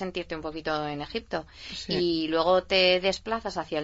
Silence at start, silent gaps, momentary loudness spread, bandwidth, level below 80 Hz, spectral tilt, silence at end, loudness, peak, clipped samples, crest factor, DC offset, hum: 0 s; none; 14 LU; 8 kHz; -52 dBFS; -4.5 dB/octave; 0 s; -27 LUFS; -10 dBFS; under 0.1%; 18 dB; under 0.1%; none